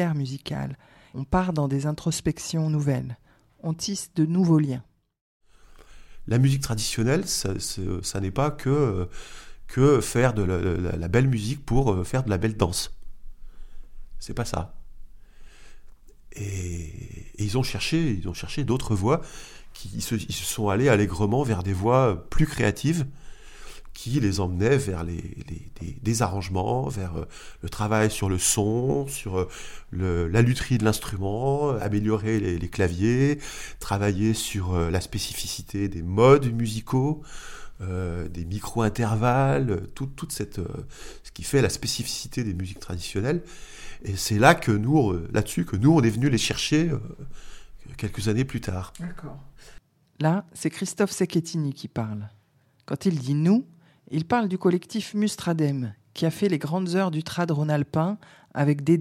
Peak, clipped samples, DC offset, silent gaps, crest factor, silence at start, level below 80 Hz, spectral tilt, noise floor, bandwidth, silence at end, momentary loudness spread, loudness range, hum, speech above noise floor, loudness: -2 dBFS; under 0.1%; under 0.1%; 5.21-5.40 s; 22 dB; 0 s; -42 dBFS; -5.5 dB/octave; -63 dBFS; 17 kHz; 0 s; 16 LU; 5 LU; none; 38 dB; -25 LUFS